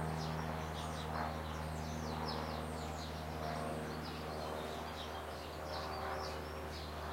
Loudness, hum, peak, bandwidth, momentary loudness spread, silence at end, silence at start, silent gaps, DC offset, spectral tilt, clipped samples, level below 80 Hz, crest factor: -43 LUFS; none; -26 dBFS; 16 kHz; 4 LU; 0 s; 0 s; none; under 0.1%; -5 dB/octave; under 0.1%; -52 dBFS; 16 dB